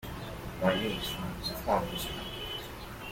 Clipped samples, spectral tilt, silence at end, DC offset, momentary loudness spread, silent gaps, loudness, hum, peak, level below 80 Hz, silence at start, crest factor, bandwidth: under 0.1%; -4.5 dB/octave; 0 s; under 0.1%; 11 LU; none; -34 LUFS; none; -14 dBFS; -48 dBFS; 0 s; 22 dB; 16.5 kHz